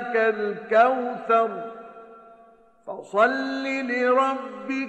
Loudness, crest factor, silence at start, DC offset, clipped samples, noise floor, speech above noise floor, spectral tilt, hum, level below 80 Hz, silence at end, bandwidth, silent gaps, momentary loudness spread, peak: -23 LUFS; 18 dB; 0 s; under 0.1%; under 0.1%; -54 dBFS; 31 dB; -5 dB/octave; none; -72 dBFS; 0 s; 8.8 kHz; none; 19 LU; -6 dBFS